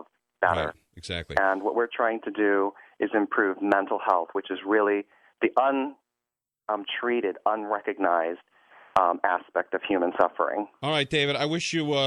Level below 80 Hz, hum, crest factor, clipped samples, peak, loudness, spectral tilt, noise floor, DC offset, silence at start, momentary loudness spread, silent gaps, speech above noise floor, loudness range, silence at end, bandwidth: -60 dBFS; none; 20 dB; under 0.1%; -6 dBFS; -26 LUFS; -5 dB/octave; -89 dBFS; under 0.1%; 0.4 s; 8 LU; none; 63 dB; 2 LU; 0 s; 11 kHz